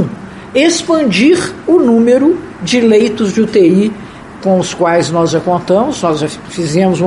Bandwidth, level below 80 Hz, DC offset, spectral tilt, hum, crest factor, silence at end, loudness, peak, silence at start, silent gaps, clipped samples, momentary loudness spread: 11.5 kHz; -46 dBFS; under 0.1%; -5.5 dB/octave; none; 12 dB; 0 s; -11 LUFS; 0 dBFS; 0 s; none; under 0.1%; 10 LU